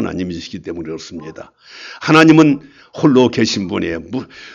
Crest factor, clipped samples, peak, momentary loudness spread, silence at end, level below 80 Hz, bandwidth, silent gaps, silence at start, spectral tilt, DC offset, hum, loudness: 16 dB; under 0.1%; 0 dBFS; 23 LU; 0 s; -50 dBFS; 8 kHz; none; 0 s; -5.5 dB/octave; under 0.1%; none; -13 LUFS